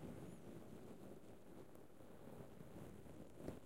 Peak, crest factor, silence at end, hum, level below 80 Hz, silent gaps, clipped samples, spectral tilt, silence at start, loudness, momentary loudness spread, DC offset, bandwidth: -36 dBFS; 22 dB; 0 s; none; -72 dBFS; none; under 0.1%; -6.5 dB/octave; 0 s; -59 LUFS; 6 LU; under 0.1%; 16 kHz